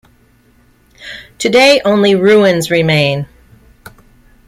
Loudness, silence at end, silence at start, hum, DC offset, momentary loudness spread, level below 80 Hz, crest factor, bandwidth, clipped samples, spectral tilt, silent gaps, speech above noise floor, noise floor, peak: -10 LUFS; 1.2 s; 1 s; none; under 0.1%; 22 LU; -48 dBFS; 14 dB; 16 kHz; under 0.1%; -5 dB/octave; none; 40 dB; -50 dBFS; 0 dBFS